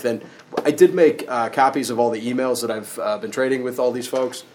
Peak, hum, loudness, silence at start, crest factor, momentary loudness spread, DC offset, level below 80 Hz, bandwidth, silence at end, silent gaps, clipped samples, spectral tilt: 0 dBFS; none; -20 LUFS; 0 s; 20 dB; 10 LU; under 0.1%; -74 dBFS; 19.5 kHz; 0.15 s; none; under 0.1%; -4.5 dB/octave